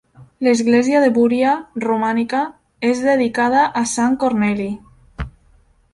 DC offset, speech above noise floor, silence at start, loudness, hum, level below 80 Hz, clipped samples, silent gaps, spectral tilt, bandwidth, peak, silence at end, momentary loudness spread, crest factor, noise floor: under 0.1%; 37 dB; 0.2 s; -17 LUFS; none; -44 dBFS; under 0.1%; none; -5 dB/octave; 11.5 kHz; -2 dBFS; 0.65 s; 13 LU; 16 dB; -54 dBFS